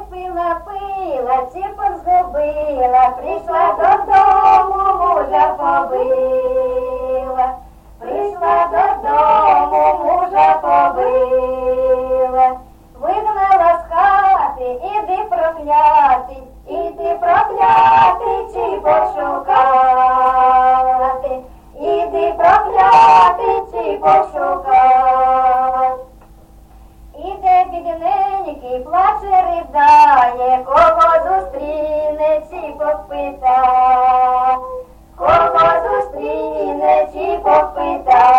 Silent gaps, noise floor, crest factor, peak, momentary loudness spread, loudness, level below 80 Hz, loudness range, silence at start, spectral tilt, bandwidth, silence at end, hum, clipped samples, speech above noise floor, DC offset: none; -42 dBFS; 12 dB; -2 dBFS; 11 LU; -14 LUFS; -40 dBFS; 5 LU; 0 s; -5.5 dB/octave; 8.2 kHz; 0 s; none; under 0.1%; 29 dB; under 0.1%